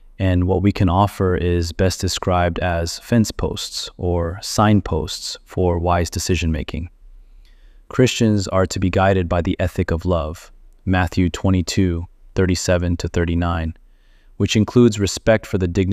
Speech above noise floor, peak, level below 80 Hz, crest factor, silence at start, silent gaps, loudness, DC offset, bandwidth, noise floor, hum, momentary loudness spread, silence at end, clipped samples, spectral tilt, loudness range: 31 dB; -2 dBFS; -34 dBFS; 18 dB; 0.2 s; none; -19 LUFS; under 0.1%; 15.5 kHz; -49 dBFS; none; 9 LU; 0 s; under 0.1%; -5.5 dB/octave; 2 LU